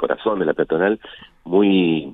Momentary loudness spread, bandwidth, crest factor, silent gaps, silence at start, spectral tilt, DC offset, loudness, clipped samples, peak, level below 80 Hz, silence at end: 8 LU; 4 kHz; 16 dB; none; 0 s; -9.5 dB/octave; under 0.1%; -19 LUFS; under 0.1%; -2 dBFS; -54 dBFS; 0 s